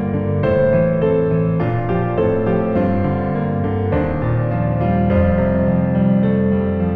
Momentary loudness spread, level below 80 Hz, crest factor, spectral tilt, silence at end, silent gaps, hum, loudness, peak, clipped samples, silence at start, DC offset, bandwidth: 4 LU; -32 dBFS; 14 dB; -11.5 dB/octave; 0 s; none; none; -17 LUFS; -2 dBFS; under 0.1%; 0 s; under 0.1%; 4.6 kHz